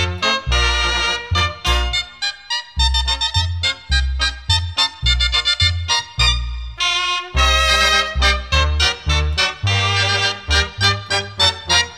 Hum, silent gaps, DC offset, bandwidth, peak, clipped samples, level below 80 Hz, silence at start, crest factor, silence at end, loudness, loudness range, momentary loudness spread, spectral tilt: none; none; 0.2%; 13.5 kHz; -2 dBFS; under 0.1%; -24 dBFS; 0 s; 16 dB; 0 s; -16 LUFS; 3 LU; 6 LU; -2.5 dB/octave